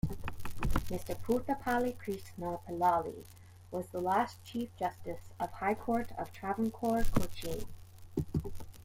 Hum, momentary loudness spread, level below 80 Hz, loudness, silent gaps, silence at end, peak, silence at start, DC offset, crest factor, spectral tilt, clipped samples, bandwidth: none; 12 LU; -44 dBFS; -36 LUFS; none; 0 s; -14 dBFS; 0.05 s; under 0.1%; 20 dB; -6.5 dB/octave; under 0.1%; 16.5 kHz